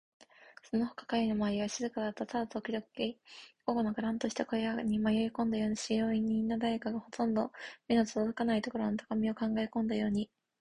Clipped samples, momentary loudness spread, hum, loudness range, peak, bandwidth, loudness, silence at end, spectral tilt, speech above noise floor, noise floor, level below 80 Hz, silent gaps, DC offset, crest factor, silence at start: under 0.1%; 7 LU; none; 3 LU; -16 dBFS; 10.5 kHz; -34 LUFS; 0.35 s; -5.5 dB/octave; 25 dB; -58 dBFS; -64 dBFS; none; under 0.1%; 16 dB; 0.4 s